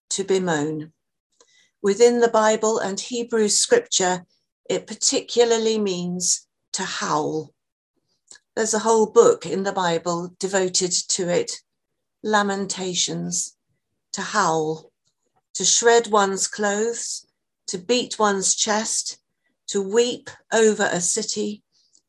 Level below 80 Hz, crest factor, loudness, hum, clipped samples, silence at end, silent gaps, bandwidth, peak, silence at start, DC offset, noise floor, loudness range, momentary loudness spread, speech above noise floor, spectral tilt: -70 dBFS; 20 dB; -21 LUFS; none; under 0.1%; 0.5 s; 1.20-1.30 s, 4.52-4.64 s, 6.68-6.72 s, 7.72-7.94 s, 15.50-15.54 s; 12.5 kHz; -2 dBFS; 0.1 s; under 0.1%; -81 dBFS; 4 LU; 14 LU; 60 dB; -2.5 dB/octave